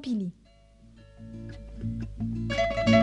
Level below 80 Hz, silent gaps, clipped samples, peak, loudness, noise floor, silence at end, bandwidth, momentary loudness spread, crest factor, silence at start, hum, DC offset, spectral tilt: -44 dBFS; none; under 0.1%; -8 dBFS; -30 LUFS; -55 dBFS; 0 s; 9.4 kHz; 17 LU; 20 dB; 0 s; none; under 0.1%; -6.5 dB/octave